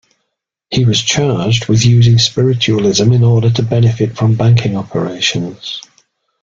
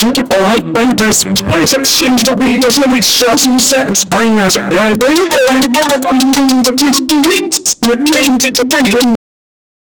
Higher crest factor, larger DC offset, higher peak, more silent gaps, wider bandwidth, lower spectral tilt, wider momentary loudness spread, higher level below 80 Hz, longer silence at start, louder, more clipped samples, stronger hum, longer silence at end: about the same, 12 dB vs 10 dB; neither; about the same, 0 dBFS vs 0 dBFS; neither; second, 7.6 kHz vs over 20 kHz; first, -5.5 dB/octave vs -3 dB/octave; first, 10 LU vs 3 LU; about the same, -44 dBFS vs -40 dBFS; first, 0.7 s vs 0 s; second, -12 LUFS vs -9 LUFS; neither; neither; second, 0.65 s vs 0.85 s